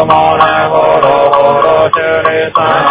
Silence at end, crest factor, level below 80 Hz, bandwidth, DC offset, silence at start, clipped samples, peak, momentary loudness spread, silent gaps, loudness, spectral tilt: 0 s; 8 dB; -40 dBFS; 4 kHz; under 0.1%; 0 s; 2%; 0 dBFS; 3 LU; none; -8 LUFS; -8.5 dB/octave